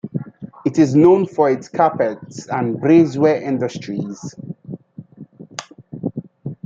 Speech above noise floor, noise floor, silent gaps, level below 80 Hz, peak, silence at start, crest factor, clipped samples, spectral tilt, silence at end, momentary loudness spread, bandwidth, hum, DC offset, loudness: 24 dB; -40 dBFS; none; -62 dBFS; -2 dBFS; 0.05 s; 16 dB; under 0.1%; -7.5 dB/octave; 0.1 s; 21 LU; 7.6 kHz; none; under 0.1%; -17 LUFS